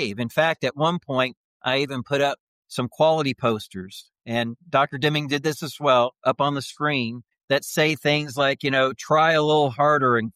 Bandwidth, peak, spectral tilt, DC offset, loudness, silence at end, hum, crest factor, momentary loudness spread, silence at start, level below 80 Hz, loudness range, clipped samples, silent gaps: 15 kHz; -8 dBFS; -5 dB/octave; under 0.1%; -22 LUFS; 0.05 s; none; 16 dB; 11 LU; 0 s; -66 dBFS; 3 LU; under 0.1%; 1.37-1.60 s, 2.40-2.63 s, 7.44-7.48 s